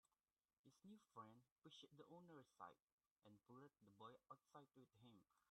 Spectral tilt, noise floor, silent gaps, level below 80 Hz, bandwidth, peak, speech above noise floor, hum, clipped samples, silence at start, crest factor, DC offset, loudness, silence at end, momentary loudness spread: -5.5 dB/octave; under -90 dBFS; 0.58-0.64 s, 1.52-1.56 s, 2.82-2.98 s, 3.11-3.16 s; under -90 dBFS; 10 kHz; -44 dBFS; over 23 dB; none; under 0.1%; 0.05 s; 24 dB; under 0.1%; -67 LUFS; 0 s; 5 LU